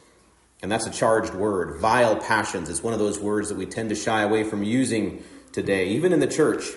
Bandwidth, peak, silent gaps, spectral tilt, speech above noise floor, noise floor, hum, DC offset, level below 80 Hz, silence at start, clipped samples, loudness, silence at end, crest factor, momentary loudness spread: 11.5 kHz; -6 dBFS; none; -4.5 dB/octave; 35 dB; -58 dBFS; none; under 0.1%; -56 dBFS; 0.6 s; under 0.1%; -23 LUFS; 0 s; 18 dB; 9 LU